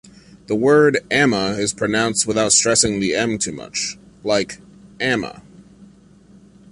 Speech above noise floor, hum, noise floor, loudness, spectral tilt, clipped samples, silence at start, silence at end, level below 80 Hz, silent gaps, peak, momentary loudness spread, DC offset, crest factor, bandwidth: 30 dB; none; -48 dBFS; -18 LUFS; -3 dB/octave; under 0.1%; 0.5 s; 0.85 s; -50 dBFS; none; -2 dBFS; 12 LU; under 0.1%; 18 dB; 11.5 kHz